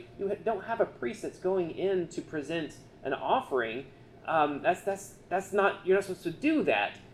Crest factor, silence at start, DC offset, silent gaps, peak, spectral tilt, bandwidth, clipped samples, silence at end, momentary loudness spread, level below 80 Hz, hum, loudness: 18 dB; 0 s; under 0.1%; none; -12 dBFS; -5 dB/octave; 13.5 kHz; under 0.1%; 0 s; 10 LU; -62 dBFS; none; -31 LUFS